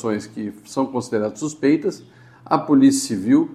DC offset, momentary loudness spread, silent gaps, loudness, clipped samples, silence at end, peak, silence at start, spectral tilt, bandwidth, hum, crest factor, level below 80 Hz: under 0.1%; 13 LU; none; -20 LUFS; under 0.1%; 0 s; 0 dBFS; 0 s; -5.5 dB/octave; 13 kHz; none; 20 dB; -64 dBFS